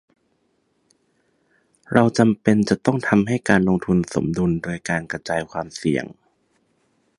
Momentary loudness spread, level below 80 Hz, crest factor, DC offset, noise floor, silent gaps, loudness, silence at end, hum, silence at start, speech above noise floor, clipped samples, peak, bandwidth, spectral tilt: 8 LU; -50 dBFS; 22 dB; under 0.1%; -67 dBFS; none; -20 LUFS; 1.05 s; none; 1.9 s; 48 dB; under 0.1%; 0 dBFS; 11.5 kHz; -6.5 dB/octave